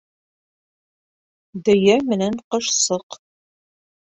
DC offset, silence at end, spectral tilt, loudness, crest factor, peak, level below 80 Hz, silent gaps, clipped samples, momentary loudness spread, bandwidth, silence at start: under 0.1%; 0.9 s; -3.5 dB/octave; -19 LUFS; 20 dB; -2 dBFS; -60 dBFS; 2.44-2.51 s, 3.03-3.10 s; under 0.1%; 10 LU; 8.4 kHz; 1.55 s